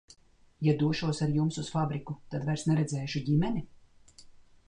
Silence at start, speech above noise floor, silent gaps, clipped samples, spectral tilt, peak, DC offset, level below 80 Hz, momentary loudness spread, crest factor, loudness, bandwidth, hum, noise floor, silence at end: 0.6 s; 26 dB; none; under 0.1%; -6.5 dB/octave; -16 dBFS; under 0.1%; -58 dBFS; 7 LU; 16 dB; -30 LUFS; 10 kHz; none; -55 dBFS; 0.3 s